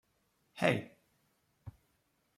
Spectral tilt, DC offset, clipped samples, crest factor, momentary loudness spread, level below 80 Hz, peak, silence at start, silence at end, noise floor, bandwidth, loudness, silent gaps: -6 dB/octave; under 0.1%; under 0.1%; 28 dB; 23 LU; -72 dBFS; -12 dBFS; 0.55 s; 0.65 s; -77 dBFS; 15.5 kHz; -34 LUFS; none